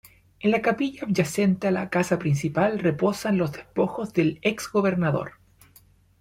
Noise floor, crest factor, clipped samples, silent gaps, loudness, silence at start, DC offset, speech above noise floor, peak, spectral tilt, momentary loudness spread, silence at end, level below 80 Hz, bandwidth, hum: -57 dBFS; 16 dB; under 0.1%; none; -24 LUFS; 0.45 s; under 0.1%; 33 dB; -8 dBFS; -6.5 dB/octave; 4 LU; 0.9 s; -58 dBFS; 16 kHz; none